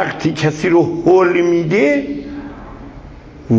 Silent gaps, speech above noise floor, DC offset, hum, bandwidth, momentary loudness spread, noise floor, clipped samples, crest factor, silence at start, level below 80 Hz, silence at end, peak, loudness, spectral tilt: none; 22 dB; under 0.1%; none; 7.8 kHz; 22 LU; -35 dBFS; under 0.1%; 16 dB; 0 s; -42 dBFS; 0 s; 0 dBFS; -14 LUFS; -7 dB/octave